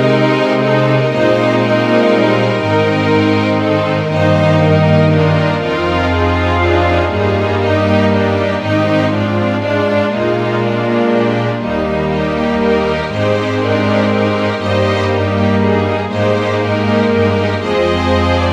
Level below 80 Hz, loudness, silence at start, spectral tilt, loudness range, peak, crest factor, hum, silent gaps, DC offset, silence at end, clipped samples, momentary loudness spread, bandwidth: -36 dBFS; -13 LUFS; 0 s; -7 dB/octave; 2 LU; 0 dBFS; 12 dB; none; none; under 0.1%; 0 s; under 0.1%; 4 LU; 9.4 kHz